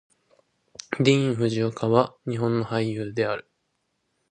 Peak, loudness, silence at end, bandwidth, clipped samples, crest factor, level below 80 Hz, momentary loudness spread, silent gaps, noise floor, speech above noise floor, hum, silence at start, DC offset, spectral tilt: -4 dBFS; -24 LUFS; 0.9 s; 10 kHz; under 0.1%; 22 dB; -64 dBFS; 13 LU; none; -75 dBFS; 51 dB; none; 0.9 s; under 0.1%; -6.5 dB/octave